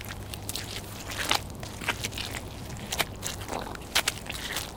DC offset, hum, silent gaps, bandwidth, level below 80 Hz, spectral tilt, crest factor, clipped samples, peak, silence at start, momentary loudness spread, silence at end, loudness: under 0.1%; none; none; 19 kHz; -46 dBFS; -2 dB/octave; 28 dB; under 0.1%; -4 dBFS; 0 s; 11 LU; 0 s; -32 LUFS